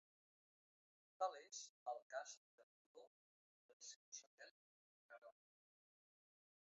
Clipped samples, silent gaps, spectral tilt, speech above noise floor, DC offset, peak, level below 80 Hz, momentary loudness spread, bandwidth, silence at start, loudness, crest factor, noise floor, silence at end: under 0.1%; 1.69-1.86 s, 2.02-2.10 s, 2.37-2.95 s, 3.07-3.80 s, 3.96-4.12 s, 4.26-4.38 s, 4.51-5.09 s, 5.18-5.22 s; 3.5 dB/octave; over 39 dB; under 0.1%; -30 dBFS; under -90 dBFS; 20 LU; 7.6 kHz; 1.2 s; -53 LUFS; 26 dB; under -90 dBFS; 1.35 s